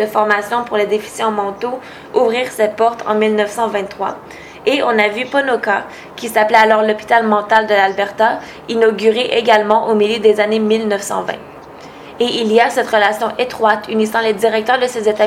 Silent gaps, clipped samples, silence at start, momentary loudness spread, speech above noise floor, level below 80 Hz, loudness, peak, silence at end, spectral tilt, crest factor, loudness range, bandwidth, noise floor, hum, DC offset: none; under 0.1%; 0 s; 11 LU; 20 dB; -56 dBFS; -15 LUFS; 0 dBFS; 0 s; -4 dB/octave; 14 dB; 4 LU; 16 kHz; -35 dBFS; none; under 0.1%